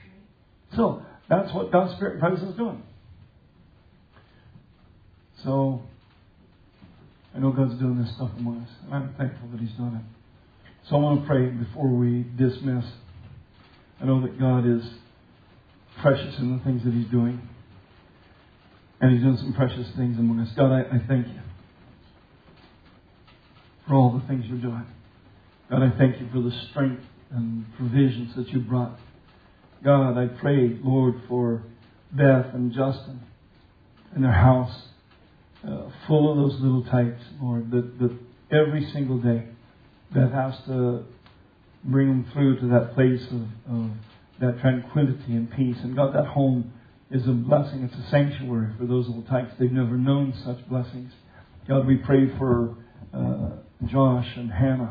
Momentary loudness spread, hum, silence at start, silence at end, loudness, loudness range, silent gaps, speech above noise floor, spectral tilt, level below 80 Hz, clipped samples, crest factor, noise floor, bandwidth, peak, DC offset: 13 LU; none; 0.7 s; 0 s; -24 LUFS; 5 LU; none; 33 dB; -11.5 dB/octave; -52 dBFS; under 0.1%; 20 dB; -56 dBFS; 5 kHz; -4 dBFS; under 0.1%